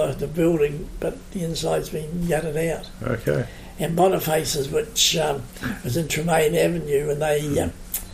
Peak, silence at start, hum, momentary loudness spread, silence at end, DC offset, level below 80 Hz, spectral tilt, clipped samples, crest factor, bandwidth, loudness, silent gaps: -6 dBFS; 0 s; none; 11 LU; 0 s; under 0.1%; -40 dBFS; -4.5 dB/octave; under 0.1%; 16 dB; 15.5 kHz; -23 LUFS; none